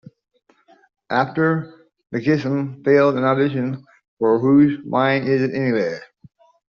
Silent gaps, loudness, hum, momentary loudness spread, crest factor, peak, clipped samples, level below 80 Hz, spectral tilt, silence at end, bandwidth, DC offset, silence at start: 4.08-4.17 s; -19 LUFS; none; 11 LU; 16 dB; -4 dBFS; under 0.1%; -62 dBFS; -6 dB/octave; 0.65 s; 6.6 kHz; under 0.1%; 1.1 s